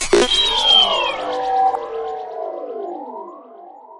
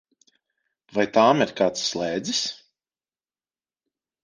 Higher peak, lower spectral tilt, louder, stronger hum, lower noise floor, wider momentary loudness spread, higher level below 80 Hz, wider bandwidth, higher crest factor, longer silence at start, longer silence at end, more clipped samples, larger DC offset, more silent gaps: about the same, -2 dBFS vs -4 dBFS; second, -1 dB/octave vs -3.5 dB/octave; first, -15 LUFS vs -22 LUFS; neither; second, -40 dBFS vs under -90 dBFS; first, 20 LU vs 12 LU; first, -42 dBFS vs -66 dBFS; first, 11.5 kHz vs 10 kHz; about the same, 18 dB vs 22 dB; second, 0 s vs 0.95 s; second, 0 s vs 1.7 s; neither; neither; neither